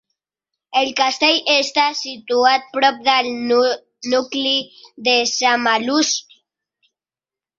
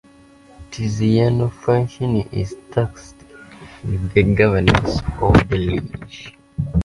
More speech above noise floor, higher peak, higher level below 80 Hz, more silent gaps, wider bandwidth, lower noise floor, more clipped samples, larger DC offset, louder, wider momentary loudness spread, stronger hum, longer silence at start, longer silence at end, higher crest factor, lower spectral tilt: first, over 72 dB vs 30 dB; about the same, 0 dBFS vs 0 dBFS; second, -68 dBFS vs -32 dBFS; neither; second, 7.8 kHz vs 11.5 kHz; first, under -90 dBFS vs -47 dBFS; neither; neither; about the same, -17 LUFS vs -19 LUFS; second, 7 LU vs 18 LU; neither; about the same, 0.7 s vs 0.6 s; first, 1.35 s vs 0 s; about the same, 18 dB vs 18 dB; second, -0.5 dB/octave vs -7.5 dB/octave